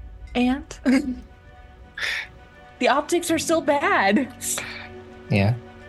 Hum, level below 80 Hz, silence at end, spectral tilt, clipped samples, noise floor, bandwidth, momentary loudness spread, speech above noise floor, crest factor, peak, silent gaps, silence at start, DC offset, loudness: none; -46 dBFS; 0 s; -4.5 dB/octave; under 0.1%; -46 dBFS; 12.5 kHz; 17 LU; 25 dB; 18 dB; -6 dBFS; none; 0 s; under 0.1%; -23 LUFS